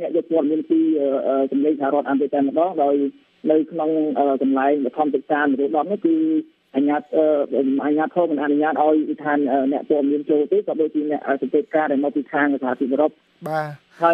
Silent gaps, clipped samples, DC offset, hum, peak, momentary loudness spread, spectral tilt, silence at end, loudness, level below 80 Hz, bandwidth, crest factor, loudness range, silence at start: none; under 0.1%; under 0.1%; none; -4 dBFS; 4 LU; -8.5 dB/octave; 0 s; -20 LUFS; -78 dBFS; 5.2 kHz; 16 dB; 1 LU; 0 s